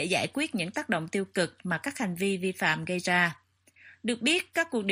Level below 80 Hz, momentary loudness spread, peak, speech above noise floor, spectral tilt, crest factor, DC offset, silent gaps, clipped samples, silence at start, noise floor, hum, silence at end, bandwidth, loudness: -72 dBFS; 7 LU; -10 dBFS; 28 dB; -4 dB/octave; 20 dB; under 0.1%; none; under 0.1%; 0 s; -57 dBFS; none; 0 s; 15.5 kHz; -29 LUFS